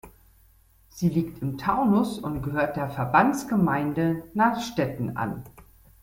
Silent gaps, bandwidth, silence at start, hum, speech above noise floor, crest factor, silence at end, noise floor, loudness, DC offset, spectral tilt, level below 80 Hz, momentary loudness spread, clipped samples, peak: none; 17 kHz; 0.05 s; none; 33 dB; 22 dB; 0.4 s; -58 dBFS; -25 LUFS; under 0.1%; -7 dB/octave; -52 dBFS; 9 LU; under 0.1%; -4 dBFS